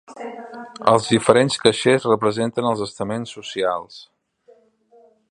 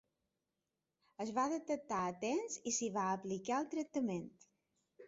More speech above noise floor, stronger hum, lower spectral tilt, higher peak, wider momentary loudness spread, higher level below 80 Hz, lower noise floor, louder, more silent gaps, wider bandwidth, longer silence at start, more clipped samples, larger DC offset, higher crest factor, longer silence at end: second, 35 dB vs 50 dB; neither; about the same, -4.5 dB/octave vs -5 dB/octave; first, 0 dBFS vs -24 dBFS; first, 18 LU vs 4 LU; first, -58 dBFS vs -80 dBFS; second, -55 dBFS vs -90 dBFS; first, -19 LUFS vs -39 LUFS; neither; first, 11.5 kHz vs 7.6 kHz; second, 0.1 s vs 1.2 s; neither; neither; about the same, 20 dB vs 16 dB; first, 1.3 s vs 0 s